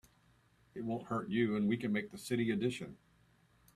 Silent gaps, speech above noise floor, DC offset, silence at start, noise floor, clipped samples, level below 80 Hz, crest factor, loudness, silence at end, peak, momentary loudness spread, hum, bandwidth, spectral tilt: none; 34 dB; under 0.1%; 0.75 s; -69 dBFS; under 0.1%; -72 dBFS; 18 dB; -36 LUFS; 0.8 s; -20 dBFS; 12 LU; none; 13.5 kHz; -6.5 dB/octave